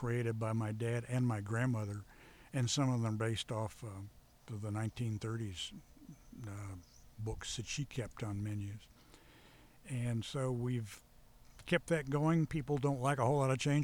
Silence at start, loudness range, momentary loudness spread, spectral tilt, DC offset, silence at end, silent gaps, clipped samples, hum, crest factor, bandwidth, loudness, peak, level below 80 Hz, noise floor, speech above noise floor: 0 s; 8 LU; 18 LU; -6 dB/octave; under 0.1%; 0 s; none; under 0.1%; none; 20 dB; 17.5 kHz; -38 LUFS; -18 dBFS; -60 dBFS; -61 dBFS; 25 dB